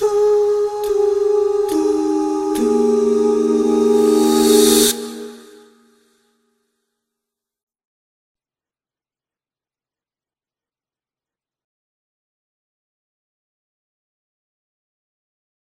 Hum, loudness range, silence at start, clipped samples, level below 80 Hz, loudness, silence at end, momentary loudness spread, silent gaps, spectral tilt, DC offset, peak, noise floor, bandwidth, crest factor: none; 4 LU; 0 s; under 0.1%; -54 dBFS; -15 LUFS; 10.2 s; 7 LU; none; -3 dB/octave; under 0.1%; 0 dBFS; under -90 dBFS; 16 kHz; 20 dB